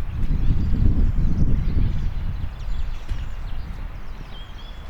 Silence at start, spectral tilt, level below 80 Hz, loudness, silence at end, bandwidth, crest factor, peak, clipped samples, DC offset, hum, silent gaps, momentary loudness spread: 0 s; -8.5 dB/octave; -22 dBFS; -26 LUFS; 0 s; 5.4 kHz; 16 dB; -4 dBFS; under 0.1%; under 0.1%; none; none; 16 LU